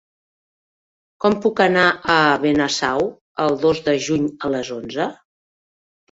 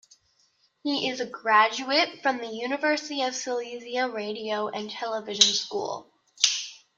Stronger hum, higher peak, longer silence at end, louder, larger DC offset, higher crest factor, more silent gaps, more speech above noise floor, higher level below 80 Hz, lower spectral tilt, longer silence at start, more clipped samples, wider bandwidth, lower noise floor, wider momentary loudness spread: neither; about the same, -2 dBFS vs -2 dBFS; first, 1 s vs 0.2 s; first, -19 LUFS vs -26 LUFS; neither; second, 18 dB vs 26 dB; first, 3.21-3.35 s vs none; first, over 72 dB vs 40 dB; first, -56 dBFS vs -78 dBFS; first, -4.5 dB/octave vs -0.5 dB/octave; first, 1.25 s vs 0.85 s; neither; second, 8 kHz vs 13 kHz; first, under -90 dBFS vs -67 dBFS; about the same, 10 LU vs 12 LU